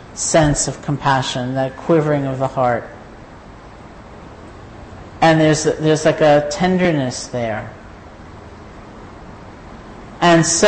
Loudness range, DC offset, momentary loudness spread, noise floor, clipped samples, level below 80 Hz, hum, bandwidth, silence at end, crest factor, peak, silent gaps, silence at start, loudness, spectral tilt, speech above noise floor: 8 LU; under 0.1%; 24 LU; -38 dBFS; under 0.1%; -42 dBFS; none; 8.8 kHz; 0 s; 14 dB; -4 dBFS; none; 0 s; -16 LUFS; -4.5 dB/octave; 22 dB